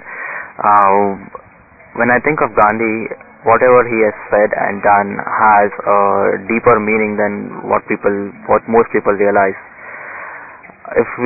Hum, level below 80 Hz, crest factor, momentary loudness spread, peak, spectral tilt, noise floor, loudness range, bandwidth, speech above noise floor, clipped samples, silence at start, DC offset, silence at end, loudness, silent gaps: none; -48 dBFS; 14 dB; 17 LU; 0 dBFS; -12 dB/octave; -43 dBFS; 4 LU; 2.7 kHz; 30 dB; under 0.1%; 0 s; under 0.1%; 0 s; -13 LUFS; none